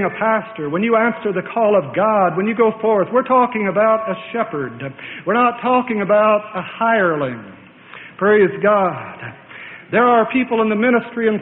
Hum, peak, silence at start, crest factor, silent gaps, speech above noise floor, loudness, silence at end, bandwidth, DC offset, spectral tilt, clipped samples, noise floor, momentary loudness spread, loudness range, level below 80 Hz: none; -2 dBFS; 0 s; 14 dB; none; 23 dB; -17 LUFS; 0 s; 4 kHz; under 0.1%; -11.5 dB/octave; under 0.1%; -39 dBFS; 15 LU; 2 LU; -60 dBFS